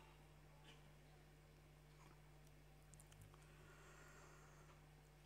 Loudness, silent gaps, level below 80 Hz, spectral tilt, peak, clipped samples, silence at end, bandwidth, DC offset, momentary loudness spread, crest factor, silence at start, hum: -66 LUFS; none; -72 dBFS; -4.5 dB/octave; -42 dBFS; under 0.1%; 0 s; 15.5 kHz; under 0.1%; 4 LU; 22 dB; 0 s; none